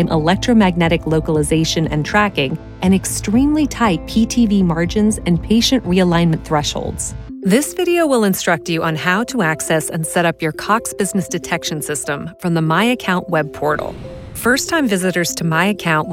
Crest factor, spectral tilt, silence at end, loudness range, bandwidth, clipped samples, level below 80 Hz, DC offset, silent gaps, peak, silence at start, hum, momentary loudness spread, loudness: 14 dB; -5 dB/octave; 0 s; 3 LU; 16.5 kHz; under 0.1%; -36 dBFS; under 0.1%; none; -2 dBFS; 0 s; none; 7 LU; -16 LUFS